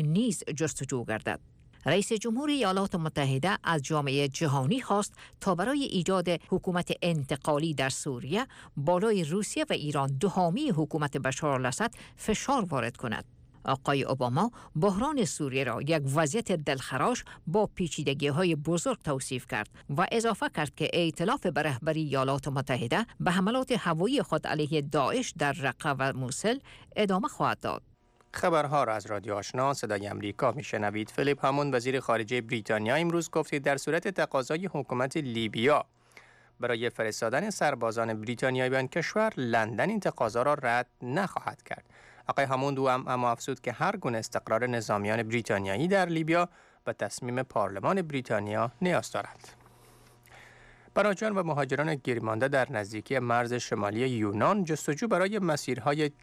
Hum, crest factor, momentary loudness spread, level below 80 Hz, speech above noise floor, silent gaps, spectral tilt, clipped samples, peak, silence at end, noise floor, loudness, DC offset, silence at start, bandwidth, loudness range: none; 14 dB; 6 LU; -60 dBFS; 28 dB; none; -5 dB/octave; under 0.1%; -16 dBFS; 0.1 s; -57 dBFS; -29 LUFS; under 0.1%; 0 s; 15.5 kHz; 2 LU